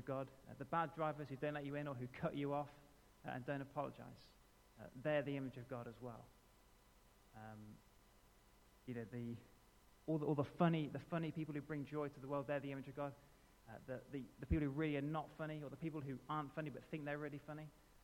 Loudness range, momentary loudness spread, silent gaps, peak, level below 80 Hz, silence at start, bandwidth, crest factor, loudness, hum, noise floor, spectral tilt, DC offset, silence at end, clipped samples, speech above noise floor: 12 LU; 17 LU; none; -22 dBFS; -64 dBFS; 0 s; 17.5 kHz; 24 dB; -45 LUFS; none; -70 dBFS; -8 dB/octave; under 0.1%; 0.1 s; under 0.1%; 25 dB